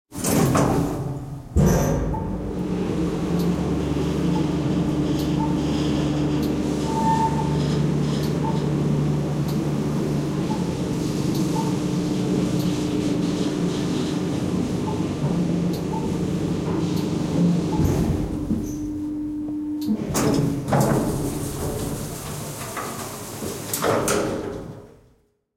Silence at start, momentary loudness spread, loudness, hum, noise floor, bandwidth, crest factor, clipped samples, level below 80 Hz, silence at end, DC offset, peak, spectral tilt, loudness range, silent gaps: 0.1 s; 8 LU; -23 LUFS; none; -61 dBFS; 16.5 kHz; 16 dB; under 0.1%; -38 dBFS; 0.65 s; under 0.1%; -6 dBFS; -6.5 dB/octave; 3 LU; none